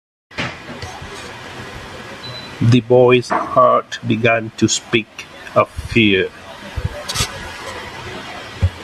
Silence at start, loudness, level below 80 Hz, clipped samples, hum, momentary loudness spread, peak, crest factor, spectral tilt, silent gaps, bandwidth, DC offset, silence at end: 0.3 s; -16 LUFS; -38 dBFS; under 0.1%; none; 18 LU; 0 dBFS; 18 dB; -5 dB/octave; none; 13.5 kHz; under 0.1%; 0 s